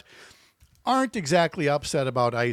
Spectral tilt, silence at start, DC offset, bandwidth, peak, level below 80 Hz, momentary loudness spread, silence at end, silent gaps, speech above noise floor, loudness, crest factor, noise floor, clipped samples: -5 dB/octave; 0.2 s; under 0.1%; 15 kHz; -8 dBFS; -58 dBFS; 3 LU; 0 s; none; 35 dB; -24 LUFS; 16 dB; -59 dBFS; under 0.1%